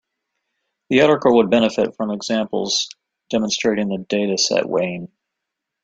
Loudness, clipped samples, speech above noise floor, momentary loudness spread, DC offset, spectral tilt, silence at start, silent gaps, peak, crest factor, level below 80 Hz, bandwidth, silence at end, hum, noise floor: -19 LUFS; under 0.1%; 63 dB; 10 LU; under 0.1%; -4 dB/octave; 0.9 s; none; -2 dBFS; 18 dB; -60 dBFS; 9.2 kHz; 0.8 s; none; -81 dBFS